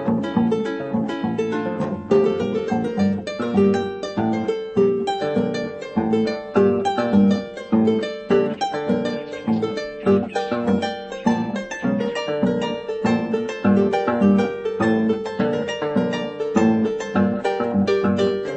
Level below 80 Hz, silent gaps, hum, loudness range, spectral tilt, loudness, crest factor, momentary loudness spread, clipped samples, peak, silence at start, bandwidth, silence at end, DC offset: -56 dBFS; none; none; 2 LU; -7 dB/octave; -21 LUFS; 16 dB; 6 LU; under 0.1%; -4 dBFS; 0 s; 8.6 kHz; 0 s; under 0.1%